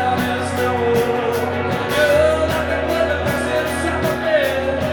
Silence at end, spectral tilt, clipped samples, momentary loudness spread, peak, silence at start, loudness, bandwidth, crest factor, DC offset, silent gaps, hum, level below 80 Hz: 0 s; -5 dB/octave; under 0.1%; 5 LU; -2 dBFS; 0 s; -18 LUFS; 19 kHz; 16 dB; under 0.1%; none; none; -36 dBFS